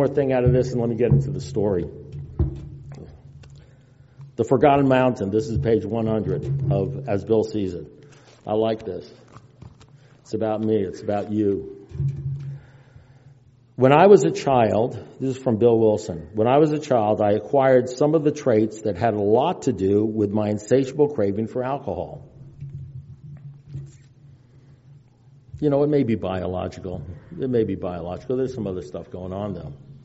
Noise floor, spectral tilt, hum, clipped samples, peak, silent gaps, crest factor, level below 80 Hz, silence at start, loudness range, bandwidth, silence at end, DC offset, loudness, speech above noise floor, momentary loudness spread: -52 dBFS; -7.5 dB/octave; none; under 0.1%; 0 dBFS; none; 22 dB; -46 dBFS; 0 s; 9 LU; 8 kHz; 0.1 s; under 0.1%; -21 LUFS; 31 dB; 20 LU